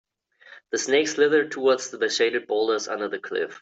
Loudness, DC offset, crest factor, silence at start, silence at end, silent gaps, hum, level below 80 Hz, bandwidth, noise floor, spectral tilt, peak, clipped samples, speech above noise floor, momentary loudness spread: -23 LUFS; under 0.1%; 16 dB; 0.5 s; 0.05 s; none; none; -74 dBFS; 8.2 kHz; -52 dBFS; -2 dB/octave; -8 dBFS; under 0.1%; 29 dB; 9 LU